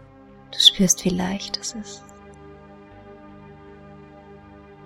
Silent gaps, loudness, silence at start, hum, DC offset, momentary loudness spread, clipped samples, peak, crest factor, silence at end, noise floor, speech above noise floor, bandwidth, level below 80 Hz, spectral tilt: none; -18 LUFS; 0.5 s; 50 Hz at -55 dBFS; under 0.1%; 23 LU; under 0.1%; 0 dBFS; 26 dB; 0.25 s; -47 dBFS; 26 dB; 16 kHz; -50 dBFS; -2.5 dB/octave